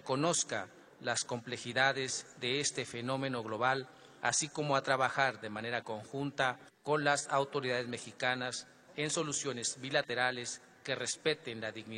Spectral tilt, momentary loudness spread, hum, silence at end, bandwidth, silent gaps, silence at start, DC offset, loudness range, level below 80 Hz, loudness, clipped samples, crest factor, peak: -2.5 dB/octave; 10 LU; none; 0 s; 11.5 kHz; none; 0.05 s; under 0.1%; 2 LU; -76 dBFS; -35 LUFS; under 0.1%; 20 dB; -14 dBFS